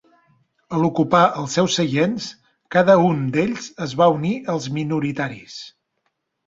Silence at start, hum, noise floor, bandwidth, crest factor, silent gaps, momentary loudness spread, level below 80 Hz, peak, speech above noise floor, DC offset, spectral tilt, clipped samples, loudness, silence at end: 0.7 s; none; -73 dBFS; 7.8 kHz; 18 dB; none; 14 LU; -58 dBFS; -2 dBFS; 54 dB; under 0.1%; -5.5 dB/octave; under 0.1%; -19 LUFS; 0.8 s